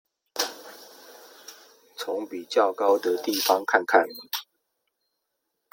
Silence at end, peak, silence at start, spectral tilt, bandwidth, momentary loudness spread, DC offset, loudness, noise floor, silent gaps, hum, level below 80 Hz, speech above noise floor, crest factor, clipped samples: 1.3 s; -4 dBFS; 0.35 s; -1.5 dB/octave; 17 kHz; 24 LU; under 0.1%; -25 LUFS; -80 dBFS; none; none; -84 dBFS; 56 dB; 24 dB; under 0.1%